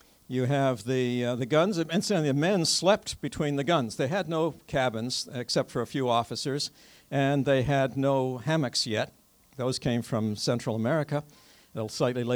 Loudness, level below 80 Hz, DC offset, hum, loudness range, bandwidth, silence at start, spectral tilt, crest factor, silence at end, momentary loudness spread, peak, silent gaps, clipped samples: -28 LUFS; -58 dBFS; under 0.1%; none; 3 LU; over 20 kHz; 0.3 s; -5 dB/octave; 18 dB; 0 s; 7 LU; -10 dBFS; none; under 0.1%